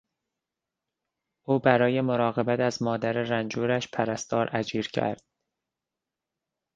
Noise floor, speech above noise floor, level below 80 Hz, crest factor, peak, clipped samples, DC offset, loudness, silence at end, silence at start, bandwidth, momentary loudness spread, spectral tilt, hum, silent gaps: -88 dBFS; 62 dB; -66 dBFS; 26 dB; -4 dBFS; under 0.1%; under 0.1%; -26 LUFS; 1.6 s; 1.5 s; 9.2 kHz; 7 LU; -5.5 dB/octave; none; none